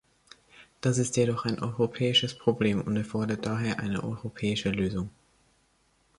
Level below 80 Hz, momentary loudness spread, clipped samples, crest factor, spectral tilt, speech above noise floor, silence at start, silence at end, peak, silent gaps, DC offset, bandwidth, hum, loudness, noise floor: -56 dBFS; 8 LU; under 0.1%; 20 dB; -5 dB/octave; 40 dB; 0.6 s; 1.1 s; -10 dBFS; none; under 0.1%; 11.5 kHz; none; -28 LUFS; -68 dBFS